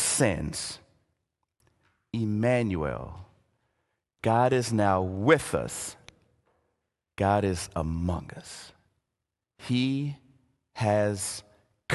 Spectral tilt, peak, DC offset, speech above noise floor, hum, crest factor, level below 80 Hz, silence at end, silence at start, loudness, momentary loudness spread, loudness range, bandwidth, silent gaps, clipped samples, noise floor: -5 dB/octave; -6 dBFS; under 0.1%; 59 dB; none; 24 dB; -48 dBFS; 0 s; 0 s; -28 LUFS; 20 LU; 5 LU; 12.5 kHz; none; under 0.1%; -86 dBFS